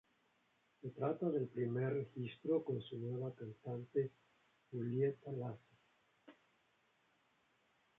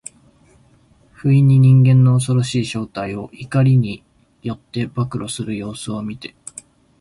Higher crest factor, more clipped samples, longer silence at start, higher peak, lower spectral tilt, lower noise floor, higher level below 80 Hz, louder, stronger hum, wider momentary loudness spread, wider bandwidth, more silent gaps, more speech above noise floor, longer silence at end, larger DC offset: about the same, 18 dB vs 14 dB; neither; second, 0.85 s vs 1.25 s; second, -26 dBFS vs -4 dBFS; about the same, -8 dB/octave vs -7 dB/octave; first, -78 dBFS vs -53 dBFS; second, -82 dBFS vs -50 dBFS; second, -42 LUFS vs -17 LUFS; neither; second, 11 LU vs 21 LU; second, 4 kHz vs 11.5 kHz; neither; about the same, 37 dB vs 37 dB; first, 1.65 s vs 0.75 s; neither